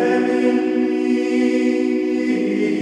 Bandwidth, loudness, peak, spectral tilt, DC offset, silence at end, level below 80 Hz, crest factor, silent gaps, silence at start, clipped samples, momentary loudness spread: 9.8 kHz; -18 LUFS; -4 dBFS; -6 dB/octave; under 0.1%; 0 s; -64 dBFS; 12 dB; none; 0 s; under 0.1%; 2 LU